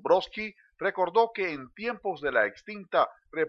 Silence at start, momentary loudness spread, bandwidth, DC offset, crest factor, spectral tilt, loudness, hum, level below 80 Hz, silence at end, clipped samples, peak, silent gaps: 0.05 s; 10 LU; 7.2 kHz; under 0.1%; 20 dB; -5.5 dB/octave; -29 LUFS; none; -66 dBFS; 0 s; under 0.1%; -10 dBFS; none